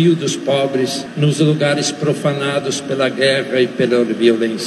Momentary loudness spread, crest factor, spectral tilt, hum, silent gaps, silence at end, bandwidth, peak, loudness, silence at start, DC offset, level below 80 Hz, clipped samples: 4 LU; 16 dB; -5 dB/octave; none; none; 0 s; 12.5 kHz; 0 dBFS; -16 LUFS; 0 s; under 0.1%; -66 dBFS; under 0.1%